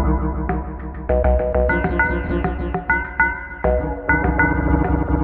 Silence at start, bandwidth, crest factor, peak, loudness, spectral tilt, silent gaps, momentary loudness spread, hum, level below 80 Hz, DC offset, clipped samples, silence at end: 0 s; 3.6 kHz; 16 dB; -2 dBFS; -20 LUFS; -11.5 dB/octave; none; 7 LU; none; -24 dBFS; under 0.1%; under 0.1%; 0 s